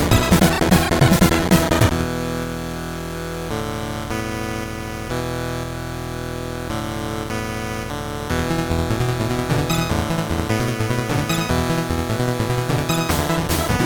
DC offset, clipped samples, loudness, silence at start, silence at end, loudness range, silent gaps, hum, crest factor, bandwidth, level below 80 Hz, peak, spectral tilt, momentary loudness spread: under 0.1%; under 0.1%; -21 LUFS; 0 s; 0 s; 8 LU; none; none; 20 dB; over 20 kHz; -32 dBFS; 0 dBFS; -5 dB/octave; 12 LU